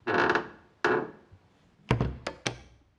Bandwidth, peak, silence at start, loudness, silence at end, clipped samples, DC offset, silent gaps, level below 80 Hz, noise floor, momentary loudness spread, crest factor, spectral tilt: 11.5 kHz; -8 dBFS; 0.05 s; -30 LUFS; 0.35 s; under 0.1%; under 0.1%; none; -48 dBFS; -62 dBFS; 17 LU; 24 dB; -5.5 dB/octave